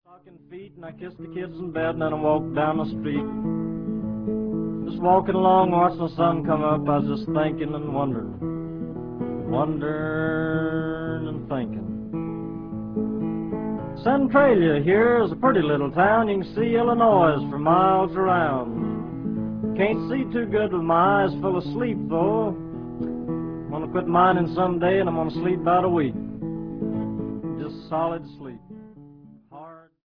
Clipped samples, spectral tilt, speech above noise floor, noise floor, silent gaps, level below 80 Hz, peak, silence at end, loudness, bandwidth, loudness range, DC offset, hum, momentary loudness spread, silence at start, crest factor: under 0.1%; -10.5 dB/octave; 26 dB; -48 dBFS; none; -50 dBFS; -6 dBFS; 0.25 s; -23 LUFS; 5.4 kHz; 8 LU; under 0.1%; none; 13 LU; 0.1 s; 18 dB